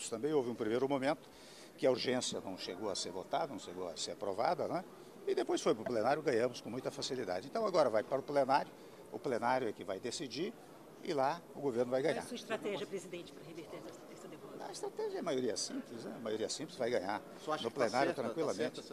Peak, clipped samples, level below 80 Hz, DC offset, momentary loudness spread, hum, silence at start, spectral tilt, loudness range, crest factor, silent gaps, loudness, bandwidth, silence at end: -16 dBFS; under 0.1%; -78 dBFS; under 0.1%; 15 LU; none; 0 s; -4 dB/octave; 6 LU; 20 dB; none; -37 LUFS; 14.5 kHz; 0 s